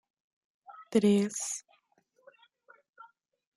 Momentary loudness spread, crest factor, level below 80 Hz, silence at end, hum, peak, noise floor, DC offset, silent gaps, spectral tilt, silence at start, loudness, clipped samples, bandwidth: 15 LU; 22 dB; -78 dBFS; 1.95 s; none; -12 dBFS; -71 dBFS; under 0.1%; none; -5 dB/octave; 0.7 s; -29 LUFS; under 0.1%; 12.5 kHz